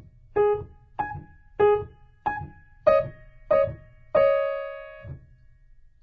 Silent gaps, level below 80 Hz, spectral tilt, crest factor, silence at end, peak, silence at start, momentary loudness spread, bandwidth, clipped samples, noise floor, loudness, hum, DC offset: none; -50 dBFS; -8 dB/octave; 20 dB; 0.85 s; -6 dBFS; 0.35 s; 21 LU; 4.8 kHz; under 0.1%; -53 dBFS; -25 LUFS; none; under 0.1%